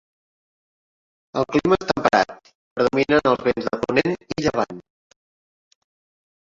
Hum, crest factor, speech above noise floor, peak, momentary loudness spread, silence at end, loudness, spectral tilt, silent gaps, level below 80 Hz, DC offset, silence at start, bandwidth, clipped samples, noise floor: none; 22 dB; over 70 dB; -2 dBFS; 10 LU; 1.8 s; -21 LUFS; -5.5 dB/octave; 2.55-2.76 s; -52 dBFS; under 0.1%; 1.35 s; 7.8 kHz; under 0.1%; under -90 dBFS